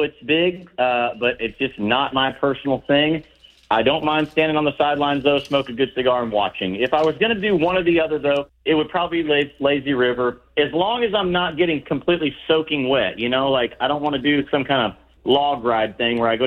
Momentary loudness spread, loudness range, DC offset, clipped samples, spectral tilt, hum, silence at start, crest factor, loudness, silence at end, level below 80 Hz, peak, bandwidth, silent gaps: 4 LU; 1 LU; under 0.1%; under 0.1%; -7 dB/octave; none; 0 s; 16 dB; -20 LUFS; 0 s; -50 dBFS; -4 dBFS; 7 kHz; none